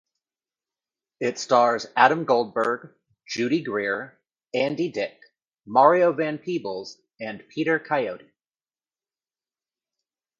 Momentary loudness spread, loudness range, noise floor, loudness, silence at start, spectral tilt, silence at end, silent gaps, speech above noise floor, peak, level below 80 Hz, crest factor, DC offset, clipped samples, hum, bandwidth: 16 LU; 7 LU; under -90 dBFS; -23 LUFS; 1.2 s; -5 dB/octave; 2.2 s; none; over 67 dB; -2 dBFS; -74 dBFS; 22 dB; under 0.1%; under 0.1%; none; 7.6 kHz